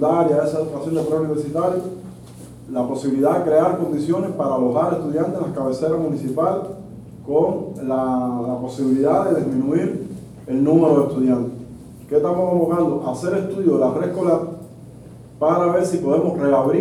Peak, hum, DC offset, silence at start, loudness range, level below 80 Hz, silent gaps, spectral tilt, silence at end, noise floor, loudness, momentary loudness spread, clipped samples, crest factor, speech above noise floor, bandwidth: -2 dBFS; none; under 0.1%; 0 s; 3 LU; -54 dBFS; none; -8 dB/octave; 0 s; -40 dBFS; -20 LUFS; 15 LU; under 0.1%; 16 dB; 21 dB; 14 kHz